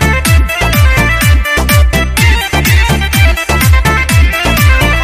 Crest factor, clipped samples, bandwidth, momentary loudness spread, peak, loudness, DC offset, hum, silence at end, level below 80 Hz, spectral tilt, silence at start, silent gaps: 8 dB; 0.2%; 16 kHz; 2 LU; 0 dBFS; -9 LUFS; under 0.1%; none; 0 s; -12 dBFS; -4.5 dB/octave; 0 s; none